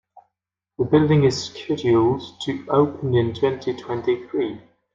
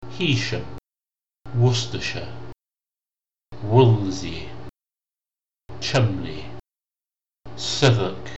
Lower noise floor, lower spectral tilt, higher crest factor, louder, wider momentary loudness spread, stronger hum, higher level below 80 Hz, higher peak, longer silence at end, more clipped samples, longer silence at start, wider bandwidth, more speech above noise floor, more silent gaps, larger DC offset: second, -84 dBFS vs under -90 dBFS; first, -7 dB/octave vs -5.5 dB/octave; about the same, 18 dB vs 22 dB; about the same, -21 LUFS vs -22 LUFS; second, 11 LU vs 21 LU; neither; second, -56 dBFS vs -50 dBFS; about the same, -4 dBFS vs -4 dBFS; first, 0.35 s vs 0 s; neither; first, 0.8 s vs 0 s; about the same, 7.8 kHz vs 8.2 kHz; second, 63 dB vs over 69 dB; neither; second, under 0.1% vs 1%